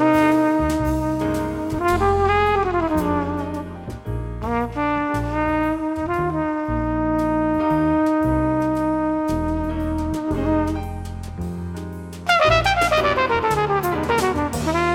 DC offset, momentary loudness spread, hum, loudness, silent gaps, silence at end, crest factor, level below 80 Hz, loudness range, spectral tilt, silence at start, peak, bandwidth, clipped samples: under 0.1%; 12 LU; none; -21 LUFS; none; 0 s; 18 dB; -34 dBFS; 4 LU; -6 dB/octave; 0 s; -2 dBFS; 16.5 kHz; under 0.1%